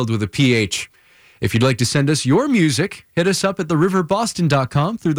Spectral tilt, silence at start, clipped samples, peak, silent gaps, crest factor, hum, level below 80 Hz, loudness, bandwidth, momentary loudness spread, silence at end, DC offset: -5 dB/octave; 0 s; under 0.1%; -6 dBFS; none; 12 dB; none; -48 dBFS; -18 LUFS; over 20 kHz; 6 LU; 0 s; under 0.1%